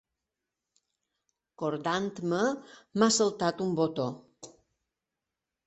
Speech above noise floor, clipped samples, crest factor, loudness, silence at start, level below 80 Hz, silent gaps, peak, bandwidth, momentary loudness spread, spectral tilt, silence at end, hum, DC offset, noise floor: 59 dB; under 0.1%; 22 dB; -29 LUFS; 1.6 s; -72 dBFS; none; -10 dBFS; 8.4 kHz; 12 LU; -4 dB/octave; 1.2 s; none; under 0.1%; -88 dBFS